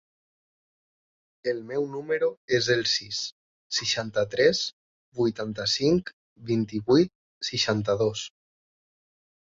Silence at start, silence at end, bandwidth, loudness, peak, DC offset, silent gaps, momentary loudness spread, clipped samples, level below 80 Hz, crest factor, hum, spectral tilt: 1.45 s; 1.25 s; 7.8 kHz; -26 LUFS; -6 dBFS; under 0.1%; 2.37-2.48 s, 3.32-3.70 s, 4.73-5.12 s, 6.13-6.36 s, 7.15-7.41 s; 12 LU; under 0.1%; -62 dBFS; 22 dB; none; -4 dB/octave